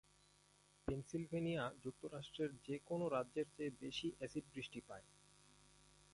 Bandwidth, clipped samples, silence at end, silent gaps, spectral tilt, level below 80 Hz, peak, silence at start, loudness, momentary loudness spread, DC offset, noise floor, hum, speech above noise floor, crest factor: 11.5 kHz; under 0.1%; 0.1 s; none; -6 dB/octave; -70 dBFS; -28 dBFS; 0.85 s; -46 LUFS; 9 LU; under 0.1%; -73 dBFS; 50 Hz at -70 dBFS; 27 dB; 20 dB